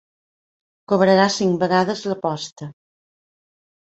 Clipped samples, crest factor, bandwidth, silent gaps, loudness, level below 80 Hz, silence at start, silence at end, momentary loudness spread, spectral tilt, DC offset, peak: under 0.1%; 18 dB; 8.2 kHz; 2.52-2.56 s; -19 LUFS; -62 dBFS; 0.9 s; 1.15 s; 17 LU; -5 dB/octave; under 0.1%; -4 dBFS